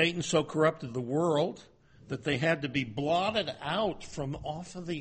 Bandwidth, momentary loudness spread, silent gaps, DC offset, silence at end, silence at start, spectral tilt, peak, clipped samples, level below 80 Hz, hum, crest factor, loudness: 8.8 kHz; 10 LU; none; under 0.1%; 0 s; 0 s; -5 dB/octave; -10 dBFS; under 0.1%; -58 dBFS; none; 20 dB; -31 LUFS